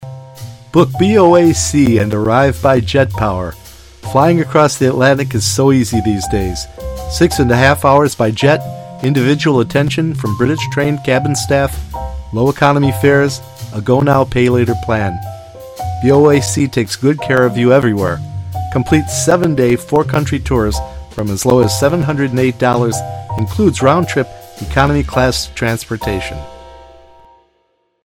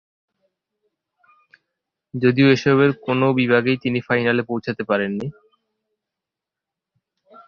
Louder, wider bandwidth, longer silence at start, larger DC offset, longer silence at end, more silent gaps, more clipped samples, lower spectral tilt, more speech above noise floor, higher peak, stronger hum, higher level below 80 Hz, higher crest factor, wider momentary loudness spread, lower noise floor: first, -13 LUFS vs -19 LUFS; first, 17 kHz vs 6.8 kHz; second, 0 s vs 2.15 s; neither; second, 1.2 s vs 2.15 s; neither; neither; second, -5.5 dB/octave vs -7 dB/octave; second, 49 dB vs 68 dB; about the same, 0 dBFS vs -2 dBFS; neither; first, -32 dBFS vs -60 dBFS; second, 14 dB vs 20 dB; about the same, 13 LU vs 11 LU; second, -61 dBFS vs -86 dBFS